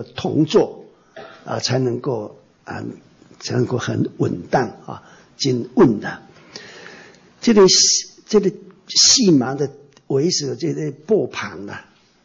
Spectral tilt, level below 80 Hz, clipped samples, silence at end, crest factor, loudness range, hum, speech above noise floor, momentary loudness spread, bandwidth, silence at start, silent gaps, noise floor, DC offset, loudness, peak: -3.5 dB/octave; -56 dBFS; under 0.1%; 0.45 s; 16 dB; 9 LU; none; 27 dB; 25 LU; 8 kHz; 0 s; none; -45 dBFS; under 0.1%; -17 LUFS; -4 dBFS